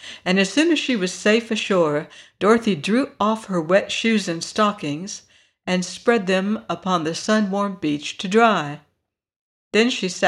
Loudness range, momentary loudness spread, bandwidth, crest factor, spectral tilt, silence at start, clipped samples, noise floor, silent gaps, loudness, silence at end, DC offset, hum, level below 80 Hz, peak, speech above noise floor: 3 LU; 9 LU; 12 kHz; 18 dB; -4.5 dB/octave; 0 s; under 0.1%; -74 dBFS; 9.36-9.71 s; -20 LUFS; 0 s; under 0.1%; none; -64 dBFS; -4 dBFS; 53 dB